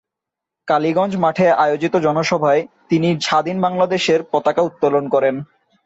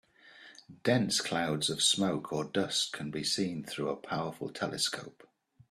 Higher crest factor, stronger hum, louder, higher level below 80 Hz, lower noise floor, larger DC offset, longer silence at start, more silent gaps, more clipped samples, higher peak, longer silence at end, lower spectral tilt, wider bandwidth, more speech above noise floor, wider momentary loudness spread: second, 14 dB vs 20 dB; neither; first, -17 LUFS vs -31 LUFS; first, -60 dBFS vs -70 dBFS; first, -84 dBFS vs -56 dBFS; neither; first, 0.65 s vs 0.25 s; neither; neither; first, -4 dBFS vs -14 dBFS; second, 0.4 s vs 0.6 s; first, -5.5 dB/octave vs -3 dB/octave; second, 8 kHz vs 14.5 kHz; first, 67 dB vs 23 dB; second, 4 LU vs 12 LU